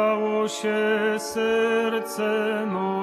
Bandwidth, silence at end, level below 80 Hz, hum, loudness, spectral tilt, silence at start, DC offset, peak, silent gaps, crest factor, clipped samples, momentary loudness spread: 14 kHz; 0 s; -68 dBFS; none; -24 LUFS; -4.5 dB/octave; 0 s; under 0.1%; -12 dBFS; none; 10 dB; under 0.1%; 4 LU